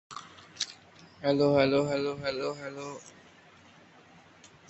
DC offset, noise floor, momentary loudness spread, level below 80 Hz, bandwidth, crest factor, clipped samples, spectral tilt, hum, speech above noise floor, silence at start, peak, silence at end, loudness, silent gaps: under 0.1%; -56 dBFS; 23 LU; -64 dBFS; 8.4 kHz; 22 dB; under 0.1%; -5 dB/octave; none; 28 dB; 0.1 s; -10 dBFS; 1.6 s; -29 LUFS; none